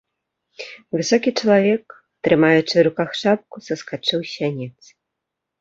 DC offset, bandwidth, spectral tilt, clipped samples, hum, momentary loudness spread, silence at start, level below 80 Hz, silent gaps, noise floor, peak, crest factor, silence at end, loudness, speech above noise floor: under 0.1%; 7.8 kHz; -5 dB/octave; under 0.1%; none; 16 LU; 0.6 s; -62 dBFS; none; -81 dBFS; -2 dBFS; 18 dB; 0.9 s; -19 LUFS; 63 dB